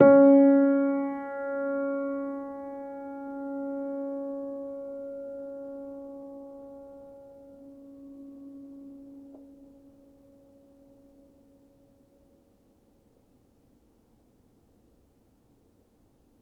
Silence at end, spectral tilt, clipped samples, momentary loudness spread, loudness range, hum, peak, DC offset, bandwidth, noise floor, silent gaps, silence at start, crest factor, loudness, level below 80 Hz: 6.95 s; -10.5 dB/octave; under 0.1%; 27 LU; 22 LU; none; -4 dBFS; under 0.1%; 2.4 kHz; -64 dBFS; none; 0 s; 24 dB; -27 LUFS; -70 dBFS